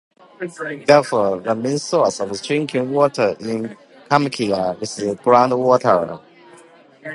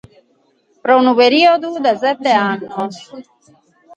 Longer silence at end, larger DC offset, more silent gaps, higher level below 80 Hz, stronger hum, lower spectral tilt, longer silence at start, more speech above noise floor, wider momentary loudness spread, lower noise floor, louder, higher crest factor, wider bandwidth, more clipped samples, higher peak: second, 0 s vs 0.75 s; neither; neither; about the same, -62 dBFS vs -64 dBFS; neither; about the same, -5 dB/octave vs -5 dB/octave; second, 0.4 s vs 0.85 s; second, 29 dB vs 44 dB; about the same, 14 LU vs 14 LU; second, -47 dBFS vs -58 dBFS; second, -18 LUFS vs -14 LUFS; about the same, 18 dB vs 16 dB; first, 11.5 kHz vs 8.6 kHz; neither; about the same, 0 dBFS vs 0 dBFS